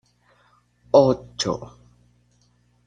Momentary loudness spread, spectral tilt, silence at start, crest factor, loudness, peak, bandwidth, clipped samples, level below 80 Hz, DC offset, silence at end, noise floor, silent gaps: 15 LU; -5.5 dB/octave; 0.95 s; 22 dB; -21 LUFS; -2 dBFS; 9.4 kHz; under 0.1%; -56 dBFS; under 0.1%; 1.2 s; -62 dBFS; none